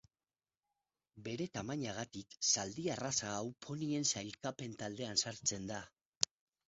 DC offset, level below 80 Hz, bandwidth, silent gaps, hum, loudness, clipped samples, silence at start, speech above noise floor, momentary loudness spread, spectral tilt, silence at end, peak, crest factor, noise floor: under 0.1%; -72 dBFS; 7.6 kHz; 6.01-6.21 s; none; -39 LUFS; under 0.1%; 1.15 s; over 50 dB; 11 LU; -3.5 dB/octave; 0.45 s; -8 dBFS; 32 dB; under -90 dBFS